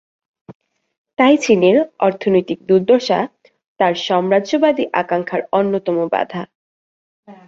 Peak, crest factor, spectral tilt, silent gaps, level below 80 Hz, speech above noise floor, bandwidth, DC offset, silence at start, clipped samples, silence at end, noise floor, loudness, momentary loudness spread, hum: -2 dBFS; 16 dB; -5.5 dB/octave; 0.55-0.60 s, 0.98-1.05 s, 3.68-3.76 s, 6.55-7.23 s; -62 dBFS; over 75 dB; 7.8 kHz; under 0.1%; 0.5 s; under 0.1%; 0.15 s; under -90 dBFS; -16 LUFS; 8 LU; none